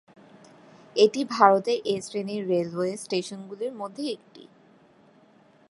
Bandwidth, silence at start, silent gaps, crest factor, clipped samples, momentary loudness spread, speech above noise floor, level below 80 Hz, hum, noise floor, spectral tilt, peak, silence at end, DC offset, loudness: 11.5 kHz; 0.95 s; none; 24 dB; under 0.1%; 15 LU; 33 dB; -76 dBFS; none; -58 dBFS; -5 dB/octave; -2 dBFS; 1.3 s; under 0.1%; -25 LUFS